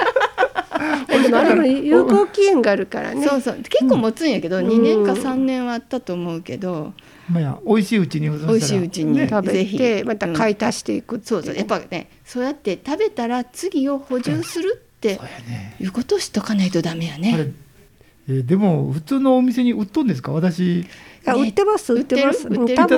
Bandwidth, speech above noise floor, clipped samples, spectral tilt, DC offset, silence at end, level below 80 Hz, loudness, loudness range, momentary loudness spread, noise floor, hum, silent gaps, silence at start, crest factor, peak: 16 kHz; 32 dB; under 0.1%; -6 dB/octave; under 0.1%; 0 s; -56 dBFS; -19 LUFS; 7 LU; 11 LU; -50 dBFS; none; none; 0 s; 18 dB; 0 dBFS